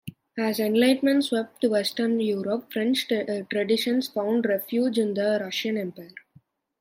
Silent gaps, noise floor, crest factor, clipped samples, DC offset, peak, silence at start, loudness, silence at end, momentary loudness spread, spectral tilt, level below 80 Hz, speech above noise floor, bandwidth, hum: none; -59 dBFS; 16 dB; under 0.1%; under 0.1%; -8 dBFS; 0.05 s; -25 LUFS; 0.6 s; 8 LU; -4.5 dB/octave; -76 dBFS; 35 dB; 16.5 kHz; none